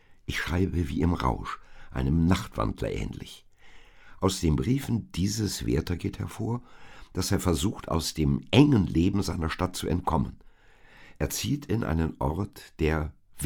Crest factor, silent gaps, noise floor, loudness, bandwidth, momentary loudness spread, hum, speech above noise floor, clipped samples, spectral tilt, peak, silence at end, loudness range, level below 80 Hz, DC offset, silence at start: 24 dB; none; -54 dBFS; -28 LUFS; 19.5 kHz; 10 LU; none; 27 dB; under 0.1%; -6 dB/octave; -4 dBFS; 0 s; 5 LU; -40 dBFS; under 0.1%; 0.1 s